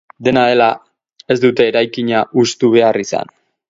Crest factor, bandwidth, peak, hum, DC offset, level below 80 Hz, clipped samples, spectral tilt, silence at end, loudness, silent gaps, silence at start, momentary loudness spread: 14 dB; 7.8 kHz; 0 dBFS; none; under 0.1%; -56 dBFS; under 0.1%; -5 dB/octave; 0.45 s; -14 LUFS; none; 0.2 s; 10 LU